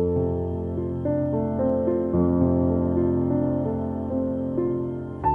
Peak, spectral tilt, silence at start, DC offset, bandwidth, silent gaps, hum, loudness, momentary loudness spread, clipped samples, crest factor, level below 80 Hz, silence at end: -8 dBFS; -12.5 dB/octave; 0 s; under 0.1%; 3.4 kHz; none; none; -24 LUFS; 7 LU; under 0.1%; 16 dB; -42 dBFS; 0 s